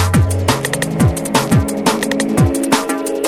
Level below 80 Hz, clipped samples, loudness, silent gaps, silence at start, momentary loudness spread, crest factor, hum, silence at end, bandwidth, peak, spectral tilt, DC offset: -30 dBFS; under 0.1%; -15 LUFS; none; 0 s; 3 LU; 14 dB; none; 0 s; 18 kHz; 0 dBFS; -5 dB/octave; under 0.1%